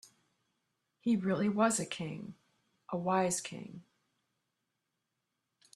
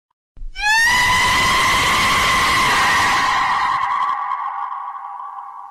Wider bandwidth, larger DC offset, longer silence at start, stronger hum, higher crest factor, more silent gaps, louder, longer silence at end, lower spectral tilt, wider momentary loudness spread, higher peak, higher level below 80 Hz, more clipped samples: second, 13 kHz vs 16.5 kHz; neither; first, 1.05 s vs 0.35 s; neither; first, 22 dB vs 10 dB; neither; second, -33 LUFS vs -15 LUFS; first, 1.95 s vs 0 s; first, -4.5 dB/octave vs -1 dB/octave; about the same, 18 LU vs 17 LU; second, -16 dBFS vs -8 dBFS; second, -76 dBFS vs -38 dBFS; neither